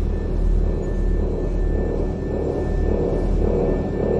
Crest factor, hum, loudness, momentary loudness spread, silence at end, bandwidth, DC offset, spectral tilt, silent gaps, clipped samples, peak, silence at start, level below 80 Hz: 12 dB; none; -23 LUFS; 3 LU; 0 s; 7.2 kHz; under 0.1%; -9.5 dB/octave; none; under 0.1%; -8 dBFS; 0 s; -22 dBFS